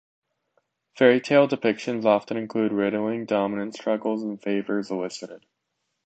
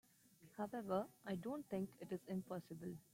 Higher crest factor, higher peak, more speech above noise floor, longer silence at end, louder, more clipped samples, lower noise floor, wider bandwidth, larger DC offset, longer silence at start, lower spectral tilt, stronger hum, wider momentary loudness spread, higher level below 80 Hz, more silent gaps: about the same, 20 dB vs 20 dB; first, -4 dBFS vs -28 dBFS; first, 55 dB vs 22 dB; first, 0.7 s vs 0.15 s; first, -24 LUFS vs -47 LUFS; neither; first, -78 dBFS vs -69 dBFS; second, 8.8 kHz vs 16.5 kHz; neither; first, 0.95 s vs 0.4 s; about the same, -6 dB/octave vs -7 dB/octave; neither; about the same, 10 LU vs 8 LU; first, -72 dBFS vs -82 dBFS; neither